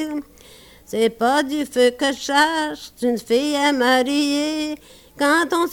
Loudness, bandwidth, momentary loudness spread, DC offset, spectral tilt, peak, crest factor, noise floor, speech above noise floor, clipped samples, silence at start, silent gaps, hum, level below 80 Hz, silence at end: -19 LUFS; 18 kHz; 10 LU; under 0.1%; -2.5 dB/octave; -4 dBFS; 16 dB; -46 dBFS; 27 dB; under 0.1%; 0 s; none; none; -56 dBFS; 0 s